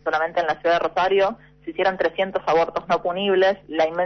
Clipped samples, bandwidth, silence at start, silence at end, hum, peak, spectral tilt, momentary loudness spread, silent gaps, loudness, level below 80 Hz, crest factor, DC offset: under 0.1%; 6.4 kHz; 0.05 s; 0 s; none; -8 dBFS; -5 dB/octave; 5 LU; none; -21 LUFS; -56 dBFS; 12 dB; under 0.1%